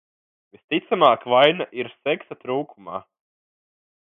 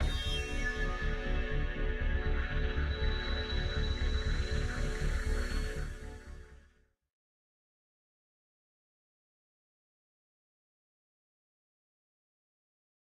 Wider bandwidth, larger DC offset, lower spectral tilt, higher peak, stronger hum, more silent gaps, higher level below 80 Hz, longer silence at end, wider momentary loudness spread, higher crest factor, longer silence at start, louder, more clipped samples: second, 5.4 kHz vs 11 kHz; neither; first, -7 dB/octave vs -5 dB/octave; first, 0 dBFS vs -20 dBFS; neither; neither; second, -72 dBFS vs -36 dBFS; second, 1.05 s vs 6.45 s; first, 18 LU vs 7 LU; first, 22 dB vs 16 dB; first, 0.7 s vs 0 s; first, -21 LUFS vs -36 LUFS; neither